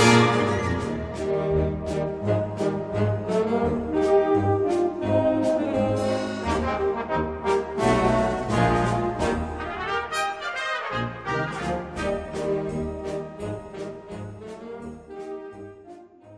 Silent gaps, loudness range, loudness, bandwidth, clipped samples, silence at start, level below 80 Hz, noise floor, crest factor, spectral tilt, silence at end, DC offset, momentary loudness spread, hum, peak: none; 8 LU; -25 LUFS; 11 kHz; under 0.1%; 0 s; -42 dBFS; -46 dBFS; 20 dB; -6 dB/octave; 0 s; under 0.1%; 16 LU; none; -4 dBFS